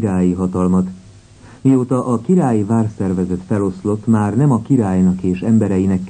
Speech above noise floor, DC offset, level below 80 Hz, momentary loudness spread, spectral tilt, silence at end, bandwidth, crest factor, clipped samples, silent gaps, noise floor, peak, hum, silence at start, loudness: 26 dB; under 0.1%; -46 dBFS; 5 LU; -9 dB/octave; 0 s; 9.6 kHz; 14 dB; under 0.1%; none; -41 dBFS; -2 dBFS; none; 0 s; -16 LUFS